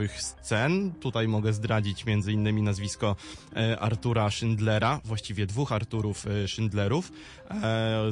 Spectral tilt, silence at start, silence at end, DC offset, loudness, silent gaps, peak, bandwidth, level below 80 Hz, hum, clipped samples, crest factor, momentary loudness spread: -6 dB/octave; 0 s; 0 s; under 0.1%; -28 LUFS; none; -12 dBFS; 11 kHz; -52 dBFS; none; under 0.1%; 16 dB; 6 LU